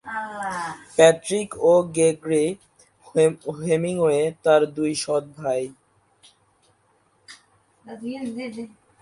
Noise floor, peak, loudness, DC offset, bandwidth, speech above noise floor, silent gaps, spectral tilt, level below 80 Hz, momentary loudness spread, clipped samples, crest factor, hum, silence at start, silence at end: -63 dBFS; 0 dBFS; -22 LUFS; under 0.1%; 11.5 kHz; 43 dB; none; -4.5 dB/octave; -64 dBFS; 17 LU; under 0.1%; 22 dB; none; 0.05 s; 0.35 s